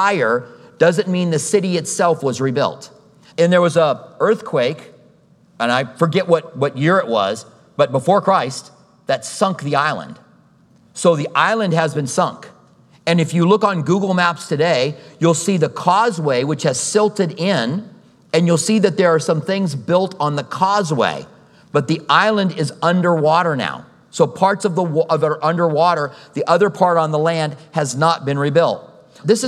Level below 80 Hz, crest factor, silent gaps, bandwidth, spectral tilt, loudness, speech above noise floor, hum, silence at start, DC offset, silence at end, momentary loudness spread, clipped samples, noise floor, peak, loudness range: -68 dBFS; 16 dB; none; 13 kHz; -5 dB/octave; -17 LUFS; 35 dB; none; 0 s; under 0.1%; 0 s; 8 LU; under 0.1%; -52 dBFS; 0 dBFS; 2 LU